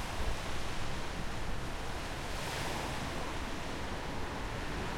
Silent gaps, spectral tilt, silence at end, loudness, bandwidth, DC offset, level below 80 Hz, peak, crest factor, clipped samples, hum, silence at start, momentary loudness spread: none; -4 dB/octave; 0 s; -39 LUFS; 16.5 kHz; under 0.1%; -42 dBFS; -22 dBFS; 14 dB; under 0.1%; none; 0 s; 3 LU